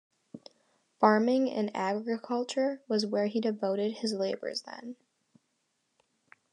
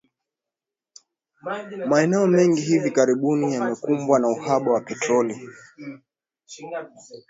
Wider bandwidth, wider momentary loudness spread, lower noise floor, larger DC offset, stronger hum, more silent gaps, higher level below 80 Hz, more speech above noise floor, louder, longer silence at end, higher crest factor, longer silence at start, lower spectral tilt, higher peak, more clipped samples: first, 11 kHz vs 8 kHz; about the same, 19 LU vs 21 LU; second, -78 dBFS vs -88 dBFS; neither; neither; neither; second, under -90 dBFS vs -70 dBFS; second, 48 dB vs 66 dB; second, -30 LUFS vs -21 LUFS; first, 1.6 s vs 0.1 s; about the same, 22 dB vs 18 dB; second, 0.35 s vs 1.45 s; about the same, -5 dB/octave vs -6 dB/octave; second, -10 dBFS vs -4 dBFS; neither